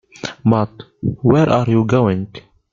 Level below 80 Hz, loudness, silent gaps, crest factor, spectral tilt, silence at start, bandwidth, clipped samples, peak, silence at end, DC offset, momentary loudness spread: -46 dBFS; -16 LUFS; none; 16 dB; -8 dB/octave; 0.25 s; 7.4 kHz; under 0.1%; 0 dBFS; 0.3 s; under 0.1%; 12 LU